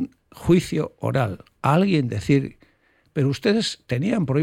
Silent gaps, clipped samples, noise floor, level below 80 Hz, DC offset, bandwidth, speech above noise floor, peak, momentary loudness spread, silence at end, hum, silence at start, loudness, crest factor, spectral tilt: none; under 0.1%; -62 dBFS; -50 dBFS; under 0.1%; 15 kHz; 41 dB; -6 dBFS; 9 LU; 0 s; none; 0 s; -22 LUFS; 16 dB; -6.5 dB/octave